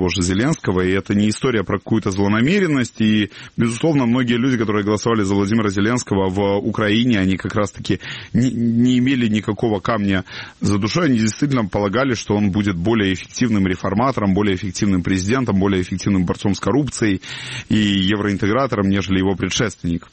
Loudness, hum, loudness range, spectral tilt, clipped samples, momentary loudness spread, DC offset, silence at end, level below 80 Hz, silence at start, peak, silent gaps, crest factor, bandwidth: -18 LUFS; none; 1 LU; -5.5 dB/octave; under 0.1%; 5 LU; 0.2%; 0.15 s; -44 dBFS; 0 s; -4 dBFS; none; 14 dB; 8.8 kHz